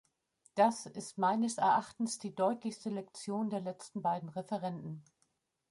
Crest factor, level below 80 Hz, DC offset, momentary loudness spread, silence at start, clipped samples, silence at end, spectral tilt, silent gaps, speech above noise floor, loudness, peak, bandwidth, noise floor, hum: 20 dB; -80 dBFS; under 0.1%; 12 LU; 0.55 s; under 0.1%; 0.7 s; -5 dB/octave; none; 44 dB; -35 LUFS; -16 dBFS; 11.5 kHz; -79 dBFS; none